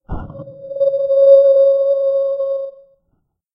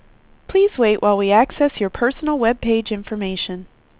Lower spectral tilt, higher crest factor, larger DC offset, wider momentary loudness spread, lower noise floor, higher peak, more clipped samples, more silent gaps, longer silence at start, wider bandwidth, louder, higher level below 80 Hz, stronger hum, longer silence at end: about the same, -9 dB/octave vs -9.5 dB/octave; about the same, 14 dB vs 16 dB; neither; first, 22 LU vs 10 LU; first, -67 dBFS vs -43 dBFS; about the same, 0 dBFS vs -2 dBFS; neither; neither; second, 0.1 s vs 0.5 s; first, 5 kHz vs 4 kHz; first, -13 LUFS vs -18 LUFS; about the same, -40 dBFS vs -44 dBFS; neither; first, 0.85 s vs 0.35 s